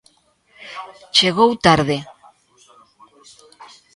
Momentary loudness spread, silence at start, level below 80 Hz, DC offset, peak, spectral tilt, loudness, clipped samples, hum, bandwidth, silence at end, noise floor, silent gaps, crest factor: 21 LU; 0.6 s; -52 dBFS; under 0.1%; 0 dBFS; -4 dB/octave; -16 LUFS; under 0.1%; none; 11.5 kHz; 0.3 s; -58 dBFS; none; 22 dB